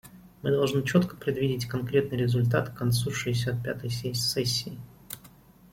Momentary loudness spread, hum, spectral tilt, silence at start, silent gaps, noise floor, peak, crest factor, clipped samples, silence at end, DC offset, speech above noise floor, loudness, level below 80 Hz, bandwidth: 15 LU; none; -5.5 dB/octave; 0.05 s; none; -54 dBFS; -8 dBFS; 20 dB; under 0.1%; 0.45 s; under 0.1%; 27 dB; -27 LUFS; -56 dBFS; 16.5 kHz